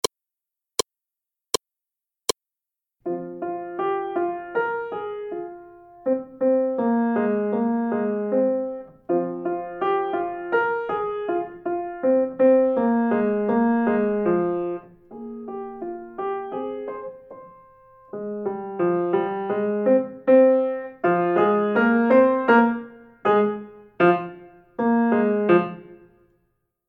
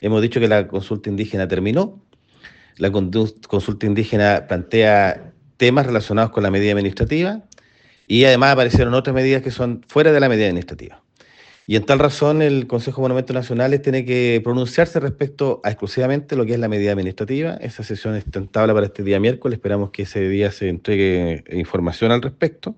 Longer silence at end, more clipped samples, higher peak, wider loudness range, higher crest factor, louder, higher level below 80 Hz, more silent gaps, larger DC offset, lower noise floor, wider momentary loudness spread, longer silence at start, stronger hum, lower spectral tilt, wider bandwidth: first, 0.95 s vs 0.05 s; neither; second, -4 dBFS vs 0 dBFS; first, 11 LU vs 5 LU; about the same, 18 dB vs 18 dB; second, -23 LUFS vs -18 LUFS; second, -64 dBFS vs -44 dBFS; neither; neither; first, -88 dBFS vs -54 dBFS; first, 16 LU vs 10 LU; first, 3.05 s vs 0 s; neither; second, -5.5 dB/octave vs -7 dB/octave; first, 16 kHz vs 8.4 kHz